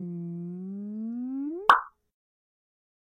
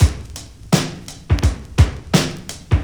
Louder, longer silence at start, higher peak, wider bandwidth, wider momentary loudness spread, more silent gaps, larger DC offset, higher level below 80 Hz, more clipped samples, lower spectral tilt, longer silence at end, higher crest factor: second, -28 LUFS vs -19 LUFS; about the same, 0 s vs 0 s; second, -6 dBFS vs 0 dBFS; second, 15.5 kHz vs over 20 kHz; about the same, 15 LU vs 16 LU; neither; neither; second, -76 dBFS vs -24 dBFS; neither; about the same, -5.5 dB/octave vs -5.5 dB/octave; first, 1.25 s vs 0 s; first, 26 dB vs 18 dB